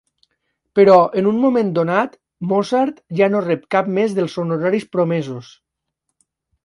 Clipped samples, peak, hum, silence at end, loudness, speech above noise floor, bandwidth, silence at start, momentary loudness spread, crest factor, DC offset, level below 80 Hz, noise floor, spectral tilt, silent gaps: under 0.1%; 0 dBFS; none; 1.2 s; -17 LUFS; 60 dB; 11.5 kHz; 0.75 s; 11 LU; 18 dB; under 0.1%; -64 dBFS; -76 dBFS; -7.5 dB/octave; none